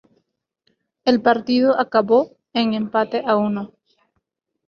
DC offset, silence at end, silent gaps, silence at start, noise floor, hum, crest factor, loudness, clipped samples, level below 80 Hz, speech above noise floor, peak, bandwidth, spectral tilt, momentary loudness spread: under 0.1%; 1 s; none; 1.05 s; -75 dBFS; none; 18 dB; -19 LUFS; under 0.1%; -64 dBFS; 57 dB; -2 dBFS; 6.6 kHz; -7 dB/octave; 8 LU